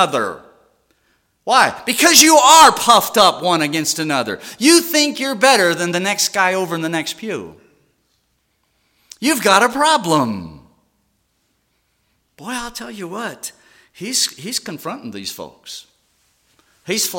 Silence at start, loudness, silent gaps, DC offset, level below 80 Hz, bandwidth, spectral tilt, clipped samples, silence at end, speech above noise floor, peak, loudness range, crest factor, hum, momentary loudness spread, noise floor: 0 s; -14 LUFS; none; under 0.1%; -58 dBFS; 17 kHz; -2 dB/octave; under 0.1%; 0 s; 50 dB; 0 dBFS; 14 LU; 18 dB; none; 21 LU; -66 dBFS